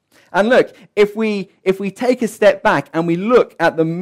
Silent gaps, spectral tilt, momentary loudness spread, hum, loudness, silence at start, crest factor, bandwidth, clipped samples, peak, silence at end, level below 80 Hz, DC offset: none; -6 dB/octave; 7 LU; none; -16 LUFS; 0.35 s; 12 dB; 15.5 kHz; under 0.1%; -4 dBFS; 0 s; -52 dBFS; under 0.1%